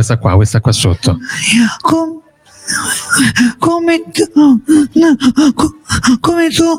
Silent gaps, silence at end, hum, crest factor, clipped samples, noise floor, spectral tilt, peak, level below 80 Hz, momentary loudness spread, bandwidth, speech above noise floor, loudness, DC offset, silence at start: none; 0 s; none; 10 dB; under 0.1%; -39 dBFS; -4.5 dB/octave; 0 dBFS; -36 dBFS; 6 LU; 16.5 kHz; 28 dB; -11 LUFS; under 0.1%; 0 s